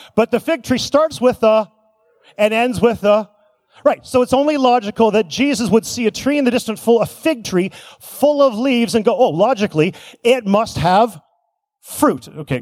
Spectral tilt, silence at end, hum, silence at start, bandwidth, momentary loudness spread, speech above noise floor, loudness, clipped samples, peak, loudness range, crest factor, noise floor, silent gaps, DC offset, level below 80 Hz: -5 dB/octave; 0 s; none; 0.15 s; 16 kHz; 6 LU; 53 dB; -16 LUFS; under 0.1%; -2 dBFS; 2 LU; 16 dB; -68 dBFS; none; under 0.1%; -50 dBFS